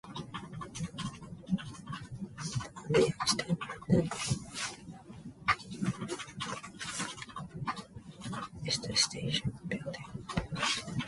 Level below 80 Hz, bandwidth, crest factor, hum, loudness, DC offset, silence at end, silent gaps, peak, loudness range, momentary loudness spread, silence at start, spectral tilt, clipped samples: -56 dBFS; 11.5 kHz; 22 dB; none; -35 LUFS; under 0.1%; 0 s; none; -14 dBFS; 5 LU; 15 LU; 0.05 s; -4 dB/octave; under 0.1%